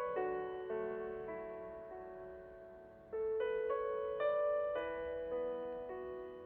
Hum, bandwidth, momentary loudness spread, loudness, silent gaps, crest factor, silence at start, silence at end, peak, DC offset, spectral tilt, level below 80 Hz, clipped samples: none; 4.3 kHz; 15 LU; -41 LUFS; none; 14 dB; 0 s; 0 s; -26 dBFS; under 0.1%; -4 dB/octave; -68 dBFS; under 0.1%